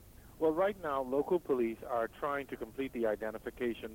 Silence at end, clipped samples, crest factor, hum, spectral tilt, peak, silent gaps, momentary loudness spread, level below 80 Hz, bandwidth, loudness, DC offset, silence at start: 0 s; under 0.1%; 14 dB; none; -6.5 dB/octave; -20 dBFS; none; 8 LU; -60 dBFS; 16.5 kHz; -35 LUFS; under 0.1%; 0 s